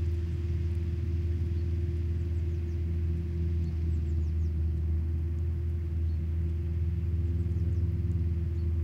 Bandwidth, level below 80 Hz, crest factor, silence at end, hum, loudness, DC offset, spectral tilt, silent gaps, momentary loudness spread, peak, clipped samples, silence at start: 3.5 kHz; -34 dBFS; 10 dB; 0 s; none; -32 LUFS; under 0.1%; -9.5 dB/octave; none; 2 LU; -20 dBFS; under 0.1%; 0 s